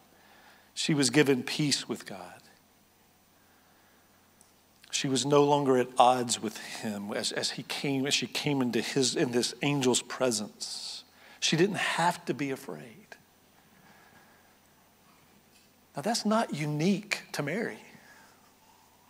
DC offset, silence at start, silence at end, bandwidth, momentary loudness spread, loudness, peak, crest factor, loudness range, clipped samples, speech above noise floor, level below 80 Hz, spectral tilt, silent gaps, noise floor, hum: under 0.1%; 0.75 s; 1.2 s; 16 kHz; 15 LU; -29 LUFS; -6 dBFS; 24 dB; 9 LU; under 0.1%; 35 dB; -80 dBFS; -4 dB/octave; none; -63 dBFS; none